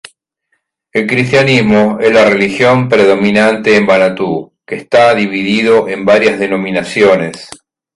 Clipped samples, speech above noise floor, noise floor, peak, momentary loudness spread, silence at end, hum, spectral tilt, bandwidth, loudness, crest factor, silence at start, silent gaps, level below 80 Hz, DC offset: under 0.1%; 55 dB; -65 dBFS; 0 dBFS; 9 LU; 0.4 s; none; -5.5 dB/octave; 11.5 kHz; -10 LUFS; 10 dB; 0.95 s; none; -48 dBFS; under 0.1%